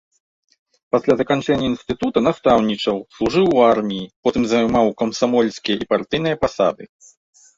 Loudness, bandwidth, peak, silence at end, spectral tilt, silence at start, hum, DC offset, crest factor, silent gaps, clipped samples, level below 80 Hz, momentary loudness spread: -18 LUFS; 7.8 kHz; -2 dBFS; 0.7 s; -5.5 dB/octave; 0.95 s; none; under 0.1%; 16 dB; 4.16-4.23 s; under 0.1%; -48 dBFS; 7 LU